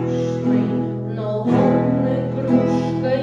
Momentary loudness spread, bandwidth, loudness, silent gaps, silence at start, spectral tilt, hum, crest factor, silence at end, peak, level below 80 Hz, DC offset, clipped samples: 7 LU; 7.4 kHz; -19 LUFS; none; 0 s; -9 dB/octave; none; 16 dB; 0 s; -4 dBFS; -50 dBFS; under 0.1%; under 0.1%